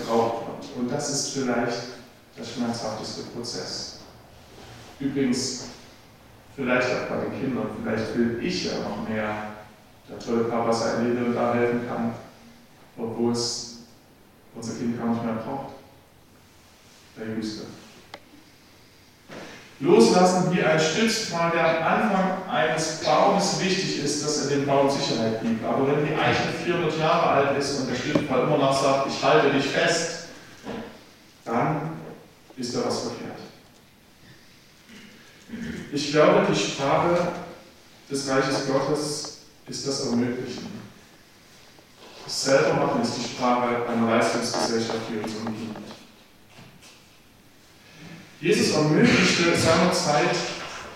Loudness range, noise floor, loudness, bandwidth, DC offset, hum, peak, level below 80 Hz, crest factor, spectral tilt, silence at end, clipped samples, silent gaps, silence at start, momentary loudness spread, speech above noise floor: 11 LU; -54 dBFS; -24 LUFS; 16 kHz; under 0.1%; none; -4 dBFS; -60 dBFS; 22 dB; -4.5 dB/octave; 0 s; under 0.1%; none; 0 s; 19 LU; 30 dB